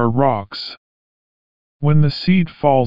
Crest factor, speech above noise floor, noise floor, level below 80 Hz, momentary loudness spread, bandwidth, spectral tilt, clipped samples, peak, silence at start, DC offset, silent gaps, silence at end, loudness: 16 dB; over 74 dB; under -90 dBFS; -48 dBFS; 13 LU; 5.4 kHz; -6.5 dB/octave; under 0.1%; -2 dBFS; 0 s; under 0.1%; 0.77-1.79 s; 0 s; -17 LUFS